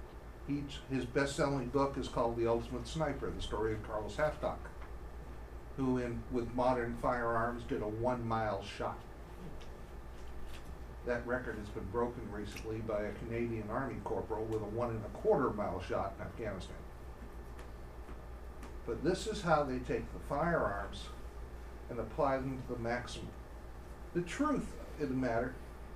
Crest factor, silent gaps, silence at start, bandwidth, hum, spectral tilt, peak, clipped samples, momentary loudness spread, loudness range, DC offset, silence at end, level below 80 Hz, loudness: 22 dB; none; 0 s; 15.5 kHz; none; -6.5 dB/octave; -16 dBFS; under 0.1%; 17 LU; 6 LU; under 0.1%; 0 s; -48 dBFS; -37 LUFS